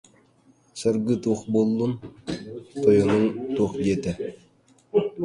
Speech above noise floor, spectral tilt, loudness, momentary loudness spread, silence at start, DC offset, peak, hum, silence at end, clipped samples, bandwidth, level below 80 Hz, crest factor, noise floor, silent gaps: 36 dB; -7 dB/octave; -24 LUFS; 15 LU; 0.75 s; under 0.1%; -6 dBFS; none; 0 s; under 0.1%; 11.5 kHz; -54 dBFS; 18 dB; -59 dBFS; none